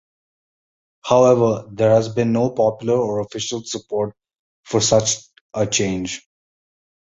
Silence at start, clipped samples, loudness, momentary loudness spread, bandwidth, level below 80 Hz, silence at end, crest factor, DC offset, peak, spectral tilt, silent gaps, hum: 1.05 s; under 0.1%; -19 LUFS; 12 LU; 8.2 kHz; -52 dBFS; 0.95 s; 20 dB; under 0.1%; -2 dBFS; -4.5 dB/octave; 4.39-4.63 s, 5.41-5.50 s; none